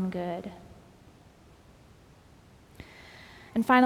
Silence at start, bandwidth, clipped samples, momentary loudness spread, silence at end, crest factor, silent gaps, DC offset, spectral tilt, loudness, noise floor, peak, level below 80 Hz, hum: 0 s; 14.5 kHz; under 0.1%; 24 LU; 0 s; 24 dB; none; under 0.1%; -6.5 dB/octave; -31 LUFS; -56 dBFS; -8 dBFS; -60 dBFS; none